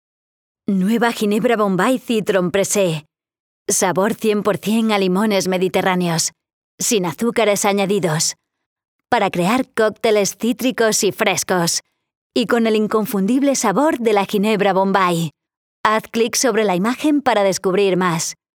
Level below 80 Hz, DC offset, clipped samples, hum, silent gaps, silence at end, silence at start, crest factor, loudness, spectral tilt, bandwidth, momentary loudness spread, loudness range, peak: -62 dBFS; under 0.1%; under 0.1%; none; 3.40-3.66 s, 6.53-6.78 s, 8.66-8.76 s, 8.88-8.99 s, 12.15-12.30 s, 15.57-15.84 s; 0.2 s; 0.7 s; 18 dB; -17 LUFS; -4 dB/octave; over 20 kHz; 4 LU; 1 LU; 0 dBFS